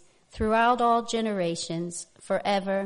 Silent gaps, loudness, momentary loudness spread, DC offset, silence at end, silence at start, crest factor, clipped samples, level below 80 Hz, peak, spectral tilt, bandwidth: none; -26 LUFS; 11 LU; under 0.1%; 0 s; 0.35 s; 16 dB; under 0.1%; -50 dBFS; -10 dBFS; -4.5 dB/octave; 10.5 kHz